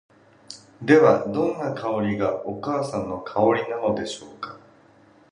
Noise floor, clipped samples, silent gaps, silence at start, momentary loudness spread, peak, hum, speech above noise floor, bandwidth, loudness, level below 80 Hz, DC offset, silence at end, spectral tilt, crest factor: -54 dBFS; under 0.1%; none; 0.5 s; 21 LU; -2 dBFS; none; 32 dB; 10.5 kHz; -23 LUFS; -58 dBFS; under 0.1%; 0.75 s; -6.5 dB/octave; 20 dB